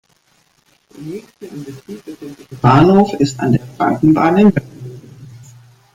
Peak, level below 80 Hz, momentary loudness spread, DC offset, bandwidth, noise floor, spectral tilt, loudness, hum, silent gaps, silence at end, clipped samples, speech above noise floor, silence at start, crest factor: 0 dBFS; -46 dBFS; 23 LU; under 0.1%; 11.5 kHz; -57 dBFS; -7.5 dB/octave; -13 LUFS; none; none; 0.55 s; under 0.1%; 43 dB; 1 s; 16 dB